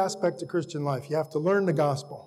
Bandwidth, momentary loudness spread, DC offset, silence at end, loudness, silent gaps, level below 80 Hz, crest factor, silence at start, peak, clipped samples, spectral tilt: 13.5 kHz; 7 LU; under 0.1%; 0 s; -27 LUFS; none; -74 dBFS; 14 dB; 0 s; -14 dBFS; under 0.1%; -6.5 dB/octave